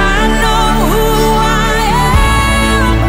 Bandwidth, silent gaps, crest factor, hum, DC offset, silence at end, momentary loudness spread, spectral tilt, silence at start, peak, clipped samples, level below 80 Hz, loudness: 16.5 kHz; none; 10 dB; none; under 0.1%; 0 s; 1 LU; -4.5 dB/octave; 0 s; 0 dBFS; under 0.1%; -14 dBFS; -11 LUFS